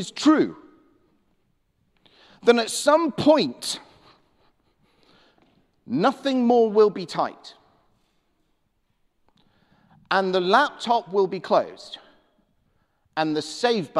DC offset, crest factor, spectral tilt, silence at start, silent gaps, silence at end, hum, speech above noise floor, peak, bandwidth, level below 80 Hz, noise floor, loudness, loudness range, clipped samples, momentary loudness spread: under 0.1%; 20 dB; -4.5 dB/octave; 0 s; none; 0 s; none; 49 dB; -4 dBFS; 14 kHz; -68 dBFS; -70 dBFS; -22 LUFS; 4 LU; under 0.1%; 11 LU